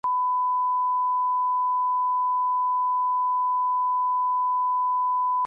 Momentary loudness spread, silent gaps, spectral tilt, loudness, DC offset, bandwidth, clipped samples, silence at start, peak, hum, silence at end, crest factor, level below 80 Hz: 0 LU; none; -4.5 dB/octave; -23 LUFS; under 0.1%; 1.6 kHz; under 0.1%; 0.05 s; -20 dBFS; 50 Hz at -105 dBFS; 0 s; 4 dB; -84 dBFS